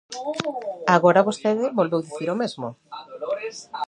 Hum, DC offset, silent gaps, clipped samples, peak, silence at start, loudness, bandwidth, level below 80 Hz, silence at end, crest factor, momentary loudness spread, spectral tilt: none; under 0.1%; none; under 0.1%; -2 dBFS; 0.1 s; -23 LUFS; 10.5 kHz; -72 dBFS; 0.05 s; 22 dB; 17 LU; -5.5 dB/octave